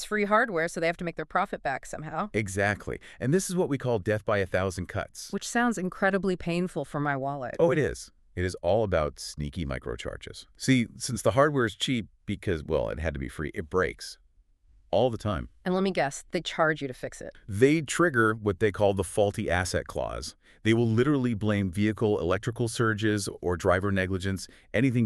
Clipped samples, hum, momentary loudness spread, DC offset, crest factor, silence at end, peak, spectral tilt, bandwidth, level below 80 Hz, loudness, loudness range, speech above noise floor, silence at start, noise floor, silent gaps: under 0.1%; none; 11 LU; under 0.1%; 20 dB; 0 s; -8 dBFS; -5.5 dB/octave; 13.5 kHz; -48 dBFS; -28 LUFS; 4 LU; 34 dB; 0 s; -61 dBFS; none